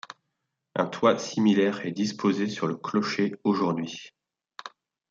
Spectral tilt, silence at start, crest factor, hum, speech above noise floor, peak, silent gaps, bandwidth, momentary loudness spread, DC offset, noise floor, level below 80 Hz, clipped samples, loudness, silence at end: -5.5 dB/octave; 0.75 s; 20 dB; none; 56 dB; -8 dBFS; none; 7.6 kHz; 20 LU; under 0.1%; -81 dBFS; -72 dBFS; under 0.1%; -26 LUFS; 0.45 s